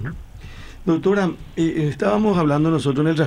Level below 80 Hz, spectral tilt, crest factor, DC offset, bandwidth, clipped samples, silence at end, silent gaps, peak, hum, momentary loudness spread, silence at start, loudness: -42 dBFS; -7.5 dB/octave; 14 dB; under 0.1%; 10.5 kHz; under 0.1%; 0 s; none; -6 dBFS; none; 20 LU; 0 s; -20 LUFS